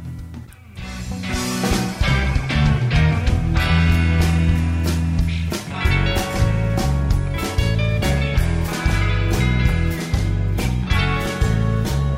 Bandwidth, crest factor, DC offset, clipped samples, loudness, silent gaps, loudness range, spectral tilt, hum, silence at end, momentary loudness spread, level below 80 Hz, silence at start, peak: 16 kHz; 12 dB; under 0.1%; under 0.1%; -20 LUFS; none; 2 LU; -6 dB/octave; none; 0 s; 7 LU; -24 dBFS; 0 s; -6 dBFS